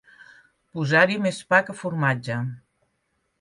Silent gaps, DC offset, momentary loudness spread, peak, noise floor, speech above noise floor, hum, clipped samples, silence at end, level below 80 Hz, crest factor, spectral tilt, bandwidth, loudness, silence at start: none; under 0.1%; 12 LU; -4 dBFS; -73 dBFS; 51 dB; none; under 0.1%; 0.8 s; -68 dBFS; 20 dB; -6 dB/octave; 11.5 kHz; -22 LUFS; 0.75 s